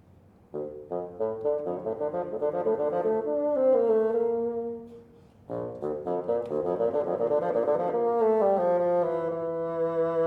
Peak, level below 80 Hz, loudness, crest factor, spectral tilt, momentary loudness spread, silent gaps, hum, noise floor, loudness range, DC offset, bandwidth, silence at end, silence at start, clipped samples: -14 dBFS; -66 dBFS; -27 LUFS; 14 dB; -9.5 dB/octave; 12 LU; none; none; -56 dBFS; 4 LU; under 0.1%; 4.4 kHz; 0 s; 0.55 s; under 0.1%